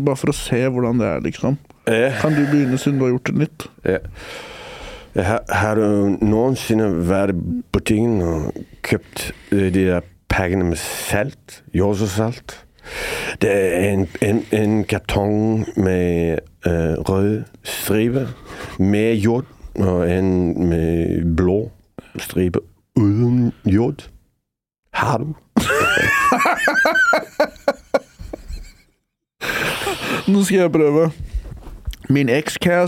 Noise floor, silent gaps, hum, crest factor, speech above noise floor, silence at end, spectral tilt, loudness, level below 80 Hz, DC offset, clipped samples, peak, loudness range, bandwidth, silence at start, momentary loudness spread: -76 dBFS; 24.79-24.83 s; none; 18 dB; 59 dB; 0 s; -6 dB/octave; -19 LUFS; -38 dBFS; under 0.1%; under 0.1%; -2 dBFS; 4 LU; 17 kHz; 0 s; 15 LU